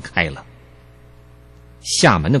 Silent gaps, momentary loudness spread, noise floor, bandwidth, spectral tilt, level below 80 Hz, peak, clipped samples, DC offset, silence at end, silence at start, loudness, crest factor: none; 19 LU; -45 dBFS; 12.5 kHz; -4 dB/octave; -40 dBFS; -2 dBFS; under 0.1%; under 0.1%; 0 s; 0 s; -16 LUFS; 18 dB